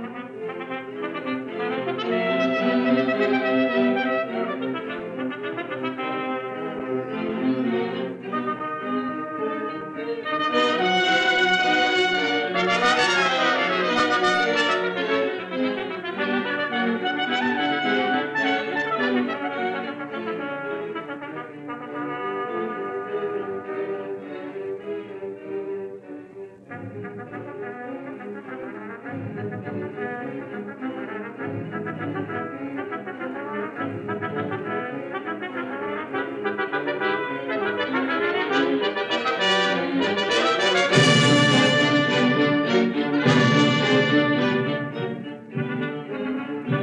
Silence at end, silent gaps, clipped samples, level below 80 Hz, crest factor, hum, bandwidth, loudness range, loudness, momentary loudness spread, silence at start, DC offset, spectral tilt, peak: 0 s; none; under 0.1%; -68 dBFS; 20 dB; none; 11 kHz; 14 LU; -23 LUFS; 15 LU; 0 s; under 0.1%; -5 dB/octave; -4 dBFS